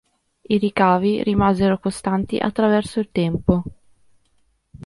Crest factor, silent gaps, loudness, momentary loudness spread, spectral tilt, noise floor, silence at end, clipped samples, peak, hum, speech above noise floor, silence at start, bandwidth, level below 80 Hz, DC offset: 18 dB; none; -20 LUFS; 6 LU; -7 dB/octave; -64 dBFS; 0.1 s; under 0.1%; -2 dBFS; none; 45 dB; 0.5 s; 11.5 kHz; -42 dBFS; under 0.1%